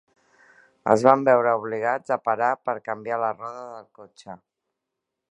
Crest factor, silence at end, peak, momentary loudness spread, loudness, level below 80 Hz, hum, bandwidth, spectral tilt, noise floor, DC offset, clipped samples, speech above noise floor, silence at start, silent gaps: 24 dB; 0.95 s; 0 dBFS; 24 LU; -22 LUFS; -72 dBFS; none; 10.5 kHz; -6.5 dB/octave; -83 dBFS; under 0.1%; under 0.1%; 60 dB; 0.85 s; none